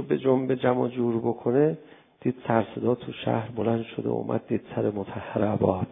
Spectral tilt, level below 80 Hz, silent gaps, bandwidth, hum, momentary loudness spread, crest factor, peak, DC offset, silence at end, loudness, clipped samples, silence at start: -12 dB/octave; -56 dBFS; none; 3.8 kHz; none; 7 LU; 20 dB; -6 dBFS; under 0.1%; 0 s; -27 LUFS; under 0.1%; 0 s